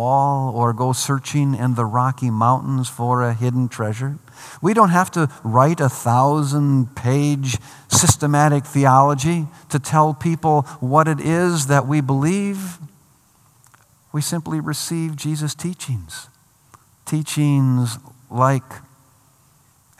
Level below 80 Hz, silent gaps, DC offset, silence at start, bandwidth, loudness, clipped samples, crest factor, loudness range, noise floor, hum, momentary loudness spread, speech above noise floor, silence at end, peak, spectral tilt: -56 dBFS; none; under 0.1%; 0 s; 15 kHz; -19 LUFS; under 0.1%; 18 dB; 9 LU; -56 dBFS; none; 12 LU; 37 dB; 1.2 s; 0 dBFS; -5.5 dB/octave